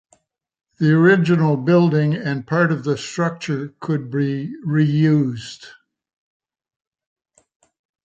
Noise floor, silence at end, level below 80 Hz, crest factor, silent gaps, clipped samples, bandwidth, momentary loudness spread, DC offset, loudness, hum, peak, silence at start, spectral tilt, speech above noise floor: -61 dBFS; 2.35 s; -62 dBFS; 18 dB; none; under 0.1%; 7.8 kHz; 12 LU; under 0.1%; -18 LUFS; none; -2 dBFS; 0.8 s; -7.5 dB/octave; 43 dB